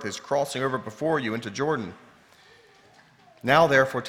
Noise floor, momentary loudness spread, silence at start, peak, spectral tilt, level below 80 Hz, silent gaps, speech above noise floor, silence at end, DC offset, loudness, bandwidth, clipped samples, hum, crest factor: -56 dBFS; 12 LU; 0 s; -4 dBFS; -5 dB/octave; -62 dBFS; none; 31 dB; 0 s; under 0.1%; -24 LUFS; 16.5 kHz; under 0.1%; none; 22 dB